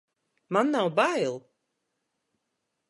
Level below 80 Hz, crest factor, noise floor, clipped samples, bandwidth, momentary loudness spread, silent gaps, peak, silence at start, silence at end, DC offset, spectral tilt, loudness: -82 dBFS; 22 dB; -81 dBFS; under 0.1%; 11.5 kHz; 8 LU; none; -8 dBFS; 0.5 s; 1.5 s; under 0.1%; -5 dB/octave; -26 LUFS